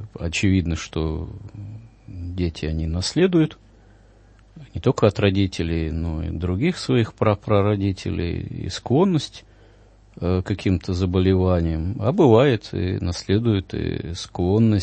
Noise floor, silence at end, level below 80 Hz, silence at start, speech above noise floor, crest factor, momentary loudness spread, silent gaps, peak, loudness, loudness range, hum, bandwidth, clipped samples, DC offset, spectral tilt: -51 dBFS; 0 s; -38 dBFS; 0 s; 30 dB; 20 dB; 12 LU; none; -2 dBFS; -22 LUFS; 5 LU; none; 8.8 kHz; under 0.1%; under 0.1%; -7 dB/octave